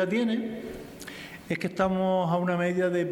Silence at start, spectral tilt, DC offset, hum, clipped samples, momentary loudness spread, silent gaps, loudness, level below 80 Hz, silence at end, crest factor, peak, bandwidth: 0 s; -7 dB/octave; under 0.1%; none; under 0.1%; 15 LU; none; -27 LUFS; -58 dBFS; 0 s; 16 dB; -12 dBFS; 19 kHz